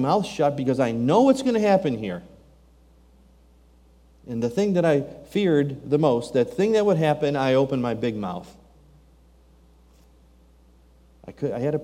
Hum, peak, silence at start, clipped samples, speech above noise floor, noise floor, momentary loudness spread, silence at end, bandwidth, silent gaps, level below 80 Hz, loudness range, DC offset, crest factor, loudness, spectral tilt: none; -6 dBFS; 0 s; under 0.1%; 33 dB; -54 dBFS; 11 LU; 0 s; 15 kHz; none; -56 dBFS; 11 LU; under 0.1%; 18 dB; -22 LUFS; -7 dB/octave